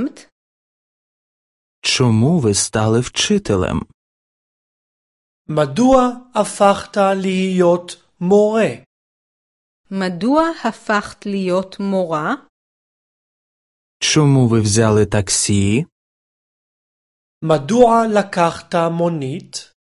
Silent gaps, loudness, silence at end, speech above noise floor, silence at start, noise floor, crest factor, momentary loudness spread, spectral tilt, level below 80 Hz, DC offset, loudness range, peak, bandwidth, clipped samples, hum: 0.32-1.82 s, 3.94-5.45 s, 8.86-9.84 s, 12.49-14.00 s, 15.92-17.41 s; -16 LUFS; 0.3 s; over 74 dB; 0 s; under -90 dBFS; 18 dB; 12 LU; -5 dB/octave; -44 dBFS; under 0.1%; 4 LU; 0 dBFS; 11.5 kHz; under 0.1%; none